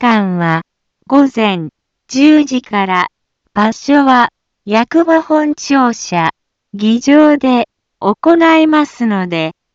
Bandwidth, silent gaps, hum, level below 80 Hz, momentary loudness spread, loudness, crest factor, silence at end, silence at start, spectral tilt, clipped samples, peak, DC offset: 7.6 kHz; none; none; -56 dBFS; 10 LU; -12 LUFS; 12 dB; 0.25 s; 0 s; -5.5 dB/octave; under 0.1%; 0 dBFS; under 0.1%